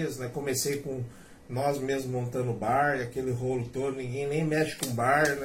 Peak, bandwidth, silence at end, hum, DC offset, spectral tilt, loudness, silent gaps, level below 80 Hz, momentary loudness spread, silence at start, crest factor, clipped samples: -10 dBFS; 16.5 kHz; 0 s; none; under 0.1%; -5 dB/octave; -30 LUFS; none; -58 dBFS; 8 LU; 0 s; 18 dB; under 0.1%